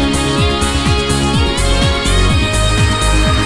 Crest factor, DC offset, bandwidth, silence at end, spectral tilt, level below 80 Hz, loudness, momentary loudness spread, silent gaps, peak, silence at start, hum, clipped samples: 12 dB; under 0.1%; 12 kHz; 0 s; -4.5 dB/octave; -18 dBFS; -13 LUFS; 1 LU; none; 0 dBFS; 0 s; none; under 0.1%